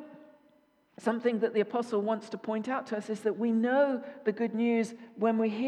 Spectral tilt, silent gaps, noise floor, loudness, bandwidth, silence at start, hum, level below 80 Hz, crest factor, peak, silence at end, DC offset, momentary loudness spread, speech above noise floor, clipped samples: -6.5 dB/octave; none; -66 dBFS; -30 LUFS; 10.5 kHz; 0 s; none; -88 dBFS; 16 dB; -14 dBFS; 0 s; under 0.1%; 8 LU; 37 dB; under 0.1%